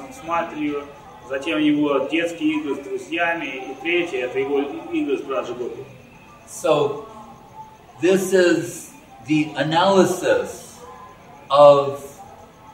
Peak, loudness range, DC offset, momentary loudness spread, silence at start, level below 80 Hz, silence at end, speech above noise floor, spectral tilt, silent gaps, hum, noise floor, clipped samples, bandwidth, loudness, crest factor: 0 dBFS; 7 LU; under 0.1%; 23 LU; 0 s; -60 dBFS; 0 s; 25 dB; -5 dB/octave; none; none; -45 dBFS; under 0.1%; 16 kHz; -20 LUFS; 22 dB